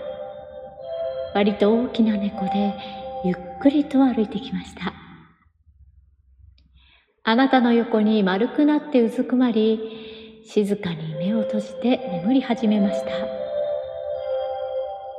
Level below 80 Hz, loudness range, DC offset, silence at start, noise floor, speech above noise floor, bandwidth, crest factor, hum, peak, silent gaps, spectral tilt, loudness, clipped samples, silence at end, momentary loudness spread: -58 dBFS; 5 LU; under 0.1%; 0 s; -57 dBFS; 36 dB; 10 kHz; 18 dB; none; -4 dBFS; none; -7.5 dB/octave; -22 LUFS; under 0.1%; 0 s; 14 LU